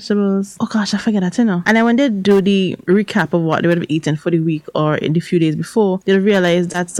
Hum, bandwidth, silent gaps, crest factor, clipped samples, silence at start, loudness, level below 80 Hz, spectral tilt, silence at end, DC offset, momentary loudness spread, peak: none; 12.5 kHz; none; 12 dB; under 0.1%; 0 s; -16 LUFS; -56 dBFS; -6 dB/octave; 0 s; under 0.1%; 5 LU; -2 dBFS